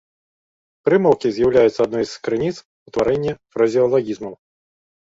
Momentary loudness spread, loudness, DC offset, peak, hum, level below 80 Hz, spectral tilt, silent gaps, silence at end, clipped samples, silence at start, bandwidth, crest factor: 13 LU; -19 LUFS; under 0.1%; -2 dBFS; none; -52 dBFS; -6.5 dB/octave; 2.65-2.86 s; 0.8 s; under 0.1%; 0.85 s; 7.8 kHz; 18 dB